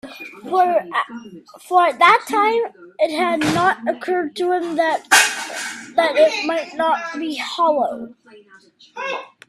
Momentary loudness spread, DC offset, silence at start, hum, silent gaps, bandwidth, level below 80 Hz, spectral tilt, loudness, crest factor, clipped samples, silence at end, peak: 15 LU; under 0.1%; 0.05 s; none; none; 15 kHz; -64 dBFS; -2.5 dB/octave; -18 LUFS; 20 dB; under 0.1%; 0.25 s; 0 dBFS